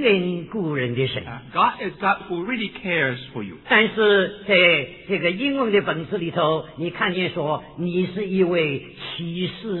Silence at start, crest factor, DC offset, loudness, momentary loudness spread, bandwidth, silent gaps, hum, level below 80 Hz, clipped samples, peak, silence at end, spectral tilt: 0 s; 20 dB; under 0.1%; -22 LUFS; 11 LU; 4.3 kHz; none; none; -56 dBFS; under 0.1%; -2 dBFS; 0 s; -9 dB/octave